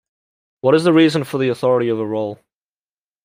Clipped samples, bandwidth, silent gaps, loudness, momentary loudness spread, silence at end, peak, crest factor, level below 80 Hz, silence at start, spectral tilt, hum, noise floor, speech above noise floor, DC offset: under 0.1%; 15.5 kHz; none; -17 LUFS; 10 LU; 0.9 s; -2 dBFS; 16 dB; -64 dBFS; 0.65 s; -6.5 dB/octave; none; under -90 dBFS; over 74 dB; under 0.1%